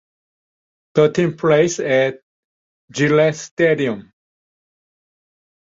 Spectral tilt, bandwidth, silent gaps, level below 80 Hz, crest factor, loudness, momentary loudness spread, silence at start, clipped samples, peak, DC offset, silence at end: -5.5 dB/octave; 7.8 kHz; 2.23-2.88 s, 3.51-3.57 s; -62 dBFS; 18 dB; -17 LUFS; 7 LU; 0.95 s; under 0.1%; -2 dBFS; under 0.1%; 1.75 s